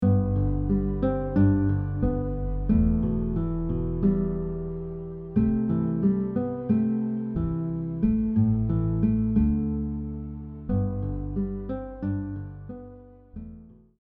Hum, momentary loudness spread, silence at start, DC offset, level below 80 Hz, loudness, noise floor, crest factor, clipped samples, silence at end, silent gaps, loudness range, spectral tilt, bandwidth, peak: none; 13 LU; 0 s; under 0.1%; -34 dBFS; -26 LUFS; -47 dBFS; 16 dB; under 0.1%; 0.35 s; none; 7 LU; -12 dB/octave; 3.4 kHz; -10 dBFS